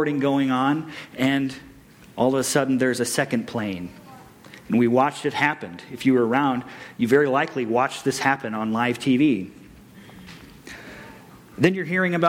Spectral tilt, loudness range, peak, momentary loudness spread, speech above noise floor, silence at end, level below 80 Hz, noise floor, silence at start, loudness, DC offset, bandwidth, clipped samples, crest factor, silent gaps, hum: -5 dB/octave; 4 LU; -6 dBFS; 21 LU; 24 dB; 0 s; -60 dBFS; -46 dBFS; 0 s; -22 LUFS; under 0.1%; 16.5 kHz; under 0.1%; 18 dB; none; none